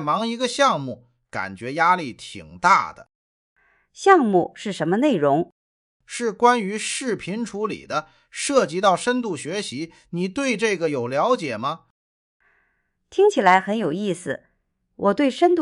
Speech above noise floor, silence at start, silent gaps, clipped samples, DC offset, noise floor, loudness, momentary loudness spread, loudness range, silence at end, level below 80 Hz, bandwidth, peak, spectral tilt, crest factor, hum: 49 dB; 0 s; 3.15-3.56 s, 5.52-6.00 s, 11.90-12.40 s; under 0.1%; under 0.1%; -70 dBFS; -21 LUFS; 15 LU; 4 LU; 0 s; -64 dBFS; 11.5 kHz; -2 dBFS; -4.5 dB/octave; 20 dB; none